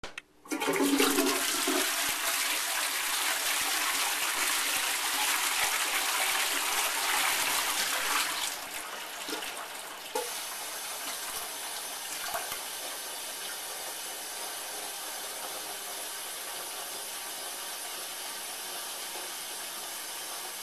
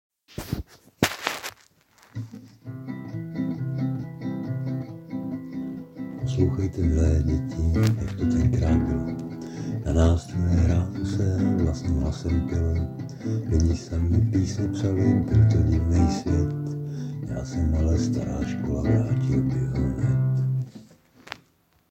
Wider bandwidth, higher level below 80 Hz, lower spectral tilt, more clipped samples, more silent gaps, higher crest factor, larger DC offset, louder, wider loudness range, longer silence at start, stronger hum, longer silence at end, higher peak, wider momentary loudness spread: second, 14 kHz vs 16 kHz; second, -68 dBFS vs -34 dBFS; second, 0.5 dB/octave vs -7.5 dB/octave; neither; neither; about the same, 20 dB vs 24 dB; neither; second, -30 LUFS vs -25 LUFS; about the same, 9 LU vs 9 LU; second, 0.05 s vs 0.4 s; neither; second, 0 s vs 0.55 s; second, -12 dBFS vs -2 dBFS; second, 10 LU vs 14 LU